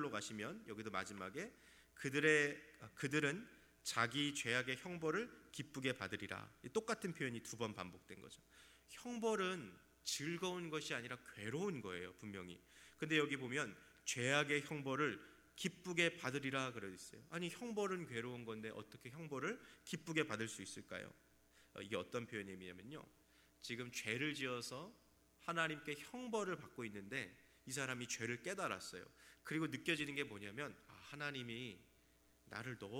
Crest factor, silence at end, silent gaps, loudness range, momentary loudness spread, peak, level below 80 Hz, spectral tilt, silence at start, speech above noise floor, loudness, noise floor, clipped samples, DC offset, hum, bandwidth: 24 dB; 0 s; none; 6 LU; 16 LU; -20 dBFS; -78 dBFS; -4 dB/octave; 0 s; 28 dB; -44 LUFS; -73 dBFS; under 0.1%; under 0.1%; none; 17 kHz